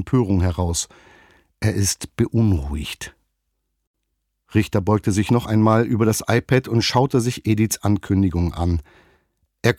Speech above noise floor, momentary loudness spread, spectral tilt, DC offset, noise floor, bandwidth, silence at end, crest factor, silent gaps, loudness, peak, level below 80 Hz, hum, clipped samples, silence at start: 55 dB; 8 LU; -5.5 dB/octave; under 0.1%; -75 dBFS; 16 kHz; 0.05 s; 18 dB; 3.87-3.94 s; -20 LUFS; -4 dBFS; -38 dBFS; none; under 0.1%; 0 s